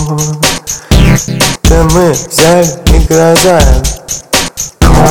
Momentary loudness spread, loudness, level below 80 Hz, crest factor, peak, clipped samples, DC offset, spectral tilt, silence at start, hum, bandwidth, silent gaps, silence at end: 7 LU; -8 LUFS; -12 dBFS; 8 dB; 0 dBFS; 3%; 2%; -4.5 dB/octave; 0 s; none; over 20 kHz; none; 0 s